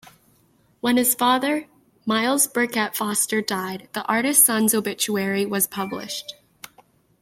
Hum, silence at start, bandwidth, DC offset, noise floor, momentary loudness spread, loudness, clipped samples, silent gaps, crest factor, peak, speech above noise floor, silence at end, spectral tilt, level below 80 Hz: none; 0.85 s; 16.5 kHz; under 0.1%; -61 dBFS; 14 LU; -21 LUFS; under 0.1%; none; 22 dB; -2 dBFS; 39 dB; 0.9 s; -2.5 dB/octave; -68 dBFS